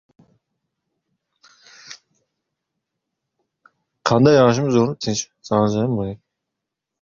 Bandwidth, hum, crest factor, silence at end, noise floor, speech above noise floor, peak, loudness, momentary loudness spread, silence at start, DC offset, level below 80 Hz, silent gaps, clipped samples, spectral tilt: 7.6 kHz; none; 20 dB; 0.85 s; -82 dBFS; 65 dB; -2 dBFS; -18 LUFS; 26 LU; 1.9 s; under 0.1%; -54 dBFS; none; under 0.1%; -6 dB/octave